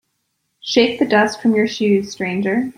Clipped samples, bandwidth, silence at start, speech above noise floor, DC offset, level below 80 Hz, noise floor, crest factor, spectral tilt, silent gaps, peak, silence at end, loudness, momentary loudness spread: under 0.1%; 11.5 kHz; 0.65 s; 54 dB; under 0.1%; -60 dBFS; -71 dBFS; 16 dB; -5 dB/octave; none; 0 dBFS; 0.05 s; -17 LUFS; 6 LU